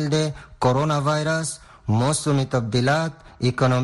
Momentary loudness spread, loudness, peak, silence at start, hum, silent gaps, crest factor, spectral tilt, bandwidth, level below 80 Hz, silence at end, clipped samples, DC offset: 7 LU; -22 LUFS; -6 dBFS; 0 s; none; none; 14 dB; -5.5 dB/octave; 12 kHz; -50 dBFS; 0 s; under 0.1%; under 0.1%